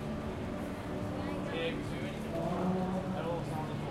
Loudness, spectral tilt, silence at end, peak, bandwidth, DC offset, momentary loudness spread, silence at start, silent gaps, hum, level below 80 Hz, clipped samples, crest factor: -36 LUFS; -7 dB/octave; 0 s; -20 dBFS; 14.5 kHz; under 0.1%; 6 LU; 0 s; none; none; -52 dBFS; under 0.1%; 14 dB